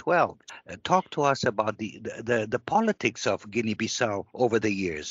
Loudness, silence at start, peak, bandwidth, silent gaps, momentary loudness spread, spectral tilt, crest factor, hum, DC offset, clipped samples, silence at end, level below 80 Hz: -27 LUFS; 0.05 s; -8 dBFS; 8 kHz; none; 11 LU; -4 dB/octave; 20 dB; none; under 0.1%; under 0.1%; 0 s; -62 dBFS